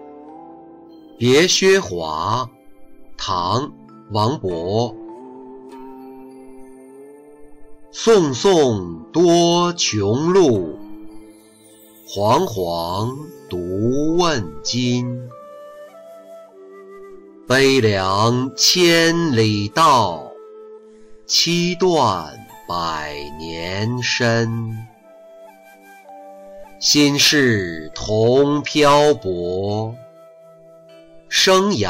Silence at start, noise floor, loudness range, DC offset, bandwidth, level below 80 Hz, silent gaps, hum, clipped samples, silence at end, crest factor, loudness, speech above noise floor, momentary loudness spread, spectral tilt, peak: 0 s; -47 dBFS; 8 LU; under 0.1%; 16 kHz; -48 dBFS; none; none; under 0.1%; 0 s; 16 dB; -17 LUFS; 30 dB; 23 LU; -4 dB/octave; -4 dBFS